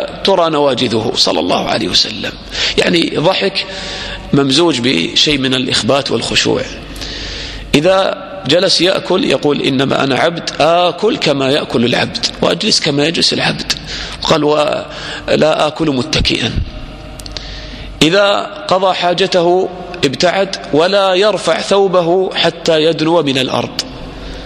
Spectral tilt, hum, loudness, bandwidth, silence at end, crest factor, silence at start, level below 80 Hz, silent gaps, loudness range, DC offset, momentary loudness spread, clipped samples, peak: -4 dB/octave; none; -13 LUFS; 14.5 kHz; 0 s; 14 dB; 0 s; -34 dBFS; none; 2 LU; under 0.1%; 12 LU; under 0.1%; 0 dBFS